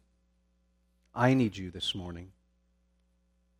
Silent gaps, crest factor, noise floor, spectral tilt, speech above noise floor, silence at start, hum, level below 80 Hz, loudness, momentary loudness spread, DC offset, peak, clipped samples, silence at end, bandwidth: none; 26 dB; -71 dBFS; -6 dB/octave; 42 dB; 1.15 s; none; -62 dBFS; -30 LUFS; 18 LU; under 0.1%; -10 dBFS; under 0.1%; 1.3 s; 11 kHz